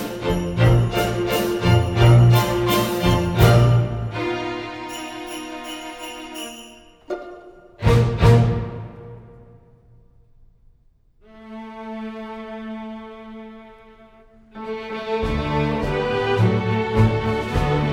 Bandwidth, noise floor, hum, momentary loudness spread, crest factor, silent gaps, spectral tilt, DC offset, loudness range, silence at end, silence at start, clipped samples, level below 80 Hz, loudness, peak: 18.5 kHz; -56 dBFS; none; 21 LU; 20 dB; none; -6.5 dB/octave; under 0.1%; 19 LU; 0 s; 0 s; under 0.1%; -34 dBFS; -19 LUFS; -2 dBFS